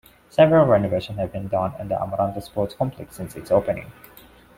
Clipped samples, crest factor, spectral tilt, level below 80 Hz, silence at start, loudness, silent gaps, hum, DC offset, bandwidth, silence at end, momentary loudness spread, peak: under 0.1%; 20 dB; -7.5 dB/octave; -50 dBFS; 0.4 s; -22 LUFS; none; none; under 0.1%; 16.5 kHz; 0.65 s; 15 LU; -2 dBFS